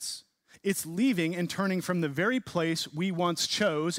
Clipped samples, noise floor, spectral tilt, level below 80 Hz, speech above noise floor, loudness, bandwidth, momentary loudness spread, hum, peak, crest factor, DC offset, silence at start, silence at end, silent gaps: under 0.1%; -52 dBFS; -4.5 dB/octave; -70 dBFS; 23 dB; -29 LUFS; 16 kHz; 5 LU; none; -14 dBFS; 16 dB; under 0.1%; 0 s; 0 s; none